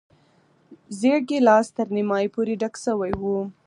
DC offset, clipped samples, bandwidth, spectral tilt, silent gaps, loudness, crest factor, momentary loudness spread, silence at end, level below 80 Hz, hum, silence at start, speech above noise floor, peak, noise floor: under 0.1%; under 0.1%; 11.5 kHz; -6 dB/octave; none; -22 LUFS; 20 dB; 9 LU; 0.15 s; -54 dBFS; none; 0.7 s; 38 dB; -4 dBFS; -60 dBFS